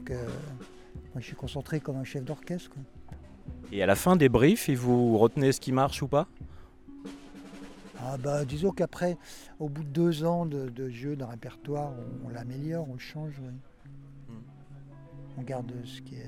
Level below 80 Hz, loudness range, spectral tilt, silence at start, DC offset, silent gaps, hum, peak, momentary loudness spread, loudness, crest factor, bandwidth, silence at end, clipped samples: -52 dBFS; 15 LU; -6.5 dB/octave; 0 s; under 0.1%; none; none; -8 dBFS; 24 LU; -29 LUFS; 22 dB; 18 kHz; 0 s; under 0.1%